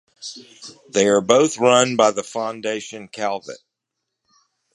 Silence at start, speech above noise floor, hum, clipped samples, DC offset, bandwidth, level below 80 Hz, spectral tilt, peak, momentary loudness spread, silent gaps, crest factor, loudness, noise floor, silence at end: 0.2 s; 61 dB; none; under 0.1%; under 0.1%; 11.5 kHz; -66 dBFS; -3.5 dB/octave; 0 dBFS; 21 LU; none; 20 dB; -19 LUFS; -80 dBFS; 1.2 s